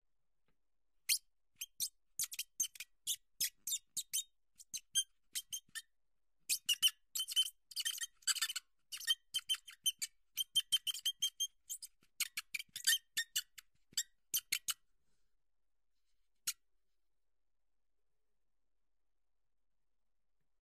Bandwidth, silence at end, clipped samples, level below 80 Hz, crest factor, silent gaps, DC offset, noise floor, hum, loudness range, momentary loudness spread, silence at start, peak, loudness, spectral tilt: 15.5 kHz; 4.1 s; under 0.1%; -86 dBFS; 26 dB; none; under 0.1%; under -90 dBFS; none; 14 LU; 14 LU; 1.1 s; -18 dBFS; -38 LUFS; 5 dB/octave